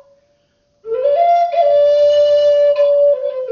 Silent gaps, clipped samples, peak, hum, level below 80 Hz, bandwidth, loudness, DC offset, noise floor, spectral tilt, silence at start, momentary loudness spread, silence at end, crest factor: none; under 0.1%; -4 dBFS; none; -64 dBFS; 6.8 kHz; -13 LUFS; under 0.1%; -61 dBFS; 0.5 dB/octave; 0.85 s; 6 LU; 0 s; 10 dB